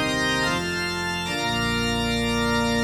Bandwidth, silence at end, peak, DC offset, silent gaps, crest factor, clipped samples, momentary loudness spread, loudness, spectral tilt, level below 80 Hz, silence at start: 17 kHz; 0 s; -12 dBFS; under 0.1%; none; 12 dB; under 0.1%; 4 LU; -23 LUFS; -4 dB/octave; -40 dBFS; 0 s